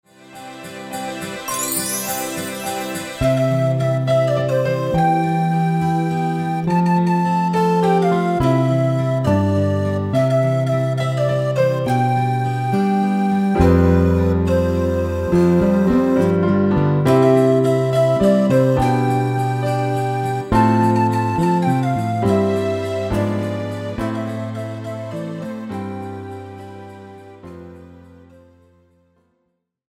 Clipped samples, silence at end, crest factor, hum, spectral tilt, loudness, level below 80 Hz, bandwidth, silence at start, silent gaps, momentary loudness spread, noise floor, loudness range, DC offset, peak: under 0.1%; 1.95 s; 16 dB; none; -7 dB/octave; -18 LUFS; -38 dBFS; 16.5 kHz; 0.3 s; none; 13 LU; -71 dBFS; 11 LU; under 0.1%; -2 dBFS